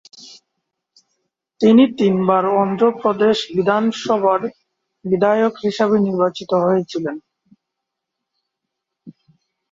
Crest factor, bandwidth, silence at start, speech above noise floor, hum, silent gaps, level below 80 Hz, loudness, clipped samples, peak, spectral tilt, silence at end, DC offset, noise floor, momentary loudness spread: 16 dB; 7.8 kHz; 0.2 s; 64 dB; none; none; -62 dBFS; -17 LUFS; under 0.1%; -2 dBFS; -6.5 dB/octave; 0.6 s; under 0.1%; -80 dBFS; 10 LU